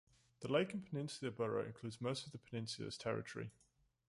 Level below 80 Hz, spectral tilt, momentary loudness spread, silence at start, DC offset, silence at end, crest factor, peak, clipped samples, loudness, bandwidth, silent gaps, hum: -76 dBFS; -5.5 dB/octave; 11 LU; 0.4 s; under 0.1%; 0.6 s; 20 dB; -24 dBFS; under 0.1%; -43 LUFS; 11.5 kHz; none; none